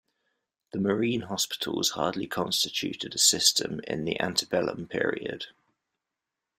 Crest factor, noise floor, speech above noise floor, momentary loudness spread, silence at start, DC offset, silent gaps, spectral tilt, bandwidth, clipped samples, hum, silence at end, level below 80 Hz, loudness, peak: 24 dB; -87 dBFS; 58 dB; 11 LU; 0.75 s; under 0.1%; none; -2.5 dB/octave; 16 kHz; under 0.1%; none; 1.1 s; -66 dBFS; -27 LUFS; -6 dBFS